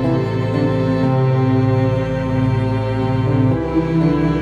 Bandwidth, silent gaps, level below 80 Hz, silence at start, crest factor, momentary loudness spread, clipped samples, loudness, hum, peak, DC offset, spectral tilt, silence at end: 7 kHz; none; -34 dBFS; 0 s; 12 dB; 3 LU; under 0.1%; -17 LUFS; none; -4 dBFS; under 0.1%; -9 dB/octave; 0 s